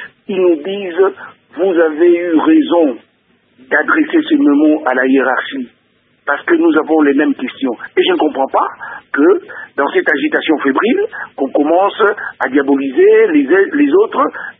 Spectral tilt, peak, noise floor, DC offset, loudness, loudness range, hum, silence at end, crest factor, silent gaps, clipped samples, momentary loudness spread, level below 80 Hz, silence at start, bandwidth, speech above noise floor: -8 dB/octave; 0 dBFS; -56 dBFS; under 0.1%; -13 LUFS; 2 LU; none; 0.1 s; 12 dB; none; under 0.1%; 10 LU; -64 dBFS; 0 s; 3.9 kHz; 44 dB